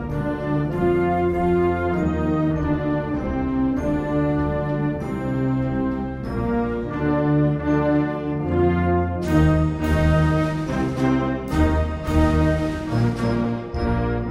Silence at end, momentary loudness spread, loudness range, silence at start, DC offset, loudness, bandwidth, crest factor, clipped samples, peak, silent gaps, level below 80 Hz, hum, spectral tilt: 0 s; 6 LU; 3 LU; 0 s; under 0.1%; -22 LUFS; 12.5 kHz; 16 dB; under 0.1%; -6 dBFS; none; -30 dBFS; none; -8.5 dB/octave